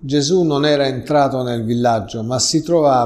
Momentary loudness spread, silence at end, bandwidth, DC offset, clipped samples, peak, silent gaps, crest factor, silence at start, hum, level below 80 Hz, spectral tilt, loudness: 5 LU; 0 s; 13.5 kHz; under 0.1%; under 0.1%; -2 dBFS; none; 14 dB; 0 s; none; -48 dBFS; -5 dB/octave; -16 LUFS